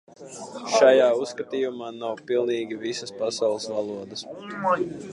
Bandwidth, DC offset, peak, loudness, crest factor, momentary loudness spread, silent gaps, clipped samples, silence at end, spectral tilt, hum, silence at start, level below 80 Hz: 11 kHz; under 0.1%; -4 dBFS; -24 LUFS; 20 dB; 18 LU; none; under 0.1%; 0 s; -3.5 dB/octave; none; 0.2 s; -72 dBFS